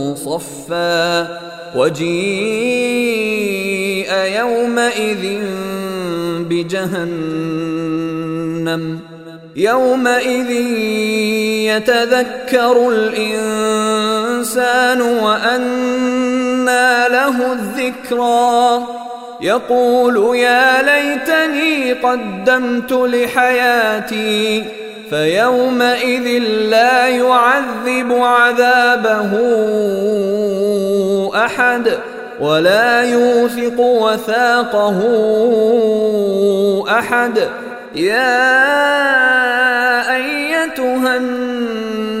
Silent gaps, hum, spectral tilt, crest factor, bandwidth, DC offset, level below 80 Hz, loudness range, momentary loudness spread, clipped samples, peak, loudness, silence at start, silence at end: none; none; -4 dB/octave; 14 dB; 16 kHz; under 0.1%; -56 dBFS; 5 LU; 9 LU; under 0.1%; 0 dBFS; -14 LUFS; 0 s; 0 s